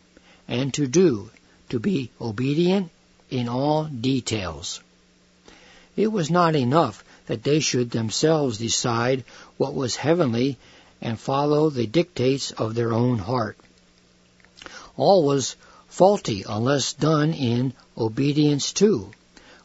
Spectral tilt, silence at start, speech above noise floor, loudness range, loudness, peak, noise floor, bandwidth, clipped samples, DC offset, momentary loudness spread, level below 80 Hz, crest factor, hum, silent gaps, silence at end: -5.5 dB/octave; 0.5 s; 36 dB; 4 LU; -23 LUFS; -2 dBFS; -58 dBFS; 8 kHz; under 0.1%; under 0.1%; 12 LU; -58 dBFS; 22 dB; none; none; 0.55 s